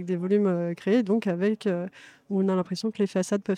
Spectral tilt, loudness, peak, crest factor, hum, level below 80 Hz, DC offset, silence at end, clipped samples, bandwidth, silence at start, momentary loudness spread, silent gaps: -7 dB/octave; -26 LUFS; -12 dBFS; 14 dB; none; -76 dBFS; under 0.1%; 0 s; under 0.1%; 11.5 kHz; 0 s; 7 LU; none